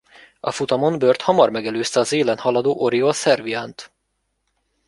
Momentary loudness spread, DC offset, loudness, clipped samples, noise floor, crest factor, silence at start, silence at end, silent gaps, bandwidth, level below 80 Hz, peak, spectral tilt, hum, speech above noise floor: 11 LU; under 0.1%; -19 LUFS; under 0.1%; -72 dBFS; 18 dB; 0.45 s; 1 s; none; 11.5 kHz; -62 dBFS; -2 dBFS; -4.5 dB/octave; none; 54 dB